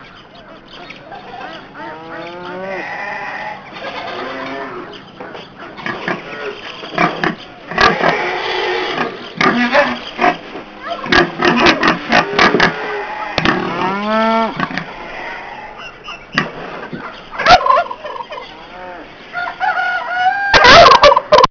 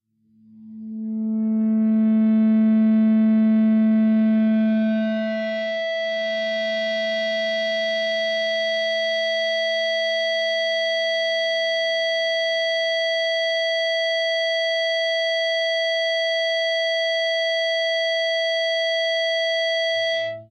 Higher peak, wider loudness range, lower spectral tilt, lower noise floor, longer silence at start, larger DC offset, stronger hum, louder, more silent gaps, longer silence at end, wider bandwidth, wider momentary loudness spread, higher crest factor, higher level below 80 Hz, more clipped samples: first, 0 dBFS vs -12 dBFS; first, 12 LU vs 4 LU; about the same, -4 dB/octave vs -4.5 dB/octave; second, -38 dBFS vs -56 dBFS; second, 0 s vs 0.55 s; neither; neither; first, -13 LUFS vs -21 LUFS; neither; about the same, 0 s vs 0.05 s; second, 5.4 kHz vs 9 kHz; first, 21 LU vs 6 LU; first, 16 dB vs 8 dB; first, -40 dBFS vs -82 dBFS; neither